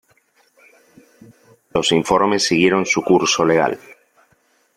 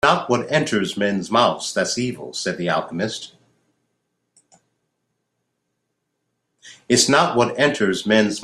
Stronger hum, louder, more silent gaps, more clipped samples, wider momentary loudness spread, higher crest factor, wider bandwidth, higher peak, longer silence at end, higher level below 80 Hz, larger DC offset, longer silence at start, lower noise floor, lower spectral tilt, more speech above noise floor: neither; first, -16 LUFS vs -19 LUFS; neither; neither; second, 7 LU vs 10 LU; about the same, 18 dB vs 20 dB; about the same, 13.5 kHz vs 13.5 kHz; about the same, -2 dBFS vs -2 dBFS; first, 1 s vs 0 s; first, -54 dBFS vs -60 dBFS; neither; first, 1.75 s vs 0.05 s; second, -60 dBFS vs -75 dBFS; about the same, -3.5 dB/octave vs -3.5 dB/octave; second, 44 dB vs 56 dB